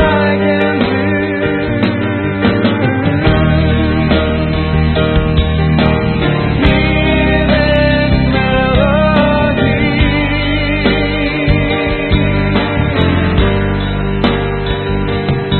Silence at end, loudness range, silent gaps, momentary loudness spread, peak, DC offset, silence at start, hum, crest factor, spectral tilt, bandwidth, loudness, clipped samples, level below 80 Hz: 0 s; 2 LU; none; 4 LU; 0 dBFS; under 0.1%; 0 s; none; 12 dB; -10 dB/octave; 4.4 kHz; -13 LUFS; under 0.1%; -20 dBFS